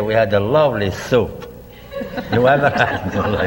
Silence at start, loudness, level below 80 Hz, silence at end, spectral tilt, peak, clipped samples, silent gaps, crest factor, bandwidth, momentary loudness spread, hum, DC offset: 0 s; -17 LUFS; -40 dBFS; 0 s; -6.5 dB/octave; -2 dBFS; under 0.1%; none; 16 dB; 16.5 kHz; 16 LU; none; under 0.1%